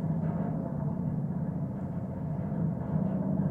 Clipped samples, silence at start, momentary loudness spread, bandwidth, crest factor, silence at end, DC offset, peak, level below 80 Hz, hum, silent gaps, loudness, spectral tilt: under 0.1%; 0 s; 5 LU; 2.8 kHz; 14 dB; 0 s; under 0.1%; -18 dBFS; -54 dBFS; none; none; -33 LUFS; -12 dB/octave